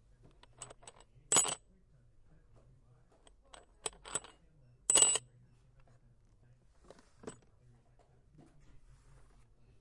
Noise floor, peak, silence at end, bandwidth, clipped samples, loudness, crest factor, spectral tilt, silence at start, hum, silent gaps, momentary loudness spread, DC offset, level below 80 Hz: -66 dBFS; -12 dBFS; 2.5 s; 11.5 kHz; under 0.1%; -31 LUFS; 30 dB; 0 dB/octave; 0.6 s; none; none; 27 LU; under 0.1%; -66 dBFS